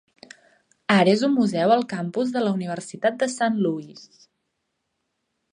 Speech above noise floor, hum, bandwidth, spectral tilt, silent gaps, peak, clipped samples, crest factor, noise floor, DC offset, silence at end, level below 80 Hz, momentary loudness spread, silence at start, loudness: 55 dB; none; 10.5 kHz; -5.5 dB/octave; none; -4 dBFS; under 0.1%; 20 dB; -77 dBFS; under 0.1%; 1.45 s; -72 dBFS; 12 LU; 0.9 s; -22 LUFS